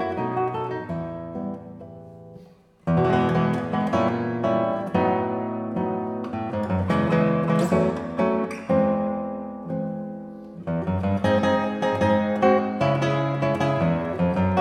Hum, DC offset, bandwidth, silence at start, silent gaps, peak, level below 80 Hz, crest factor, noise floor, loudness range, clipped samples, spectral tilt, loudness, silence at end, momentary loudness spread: none; under 0.1%; 10.5 kHz; 0 s; none; -6 dBFS; -52 dBFS; 18 dB; -51 dBFS; 4 LU; under 0.1%; -8 dB/octave; -24 LUFS; 0 s; 12 LU